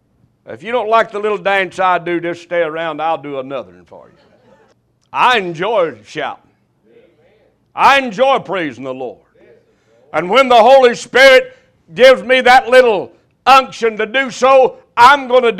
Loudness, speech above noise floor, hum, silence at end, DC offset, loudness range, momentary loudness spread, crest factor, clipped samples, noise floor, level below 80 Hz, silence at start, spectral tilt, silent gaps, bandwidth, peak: -11 LUFS; 43 dB; none; 0 s; under 0.1%; 10 LU; 17 LU; 14 dB; 0.3%; -55 dBFS; -54 dBFS; 0.5 s; -3.5 dB/octave; none; 14.5 kHz; 0 dBFS